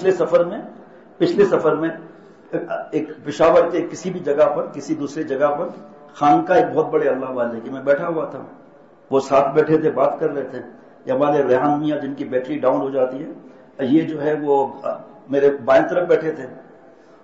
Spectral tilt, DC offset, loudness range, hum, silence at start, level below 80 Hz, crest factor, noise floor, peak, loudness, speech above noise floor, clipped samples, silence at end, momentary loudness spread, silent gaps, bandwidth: -6.5 dB/octave; 0.1%; 2 LU; none; 0 s; -60 dBFS; 14 dB; -47 dBFS; -4 dBFS; -19 LUFS; 28 dB; under 0.1%; 0.6 s; 13 LU; none; 8 kHz